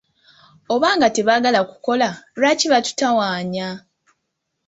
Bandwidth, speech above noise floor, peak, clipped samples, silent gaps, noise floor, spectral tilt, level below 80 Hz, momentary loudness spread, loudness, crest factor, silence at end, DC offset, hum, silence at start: 8.2 kHz; 58 dB; -2 dBFS; under 0.1%; none; -76 dBFS; -3.5 dB/octave; -62 dBFS; 9 LU; -18 LUFS; 16 dB; 0.9 s; under 0.1%; none; 0.7 s